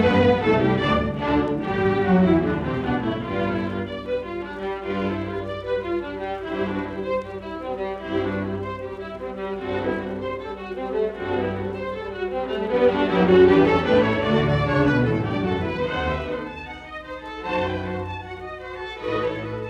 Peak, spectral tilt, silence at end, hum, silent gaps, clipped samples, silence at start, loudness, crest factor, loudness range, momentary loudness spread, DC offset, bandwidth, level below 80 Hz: -4 dBFS; -8 dB/octave; 0 s; none; none; under 0.1%; 0 s; -23 LUFS; 18 dB; 9 LU; 14 LU; under 0.1%; 8.2 kHz; -42 dBFS